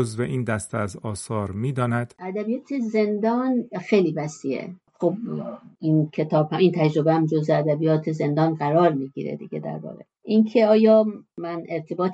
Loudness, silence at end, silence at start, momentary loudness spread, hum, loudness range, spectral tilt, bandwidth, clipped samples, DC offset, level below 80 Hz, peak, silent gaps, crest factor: -23 LUFS; 0 s; 0 s; 13 LU; none; 4 LU; -7.5 dB/octave; 11.5 kHz; under 0.1%; under 0.1%; -64 dBFS; -6 dBFS; none; 18 dB